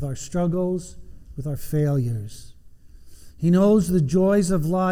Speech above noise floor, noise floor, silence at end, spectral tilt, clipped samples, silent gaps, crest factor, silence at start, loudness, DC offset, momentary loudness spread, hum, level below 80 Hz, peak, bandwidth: 24 dB; -45 dBFS; 0 s; -7.5 dB/octave; under 0.1%; none; 14 dB; 0 s; -22 LUFS; under 0.1%; 15 LU; none; -44 dBFS; -8 dBFS; 16.5 kHz